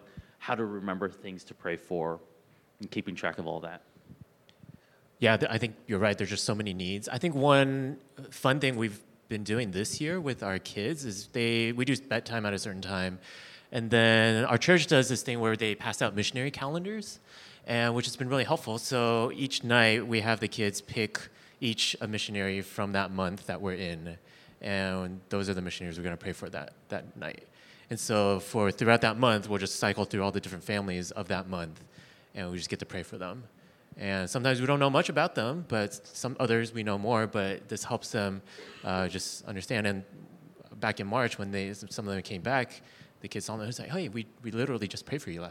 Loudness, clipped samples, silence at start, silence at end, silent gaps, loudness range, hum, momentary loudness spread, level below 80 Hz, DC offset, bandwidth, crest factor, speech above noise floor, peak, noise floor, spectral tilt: -30 LUFS; under 0.1%; 0.15 s; 0 s; none; 9 LU; none; 16 LU; -66 dBFS; under 0.1%; 16.5 kHz; 26 dB; 29 dB; -4 dBFS; -59 dBFS; -4.5 dB/octave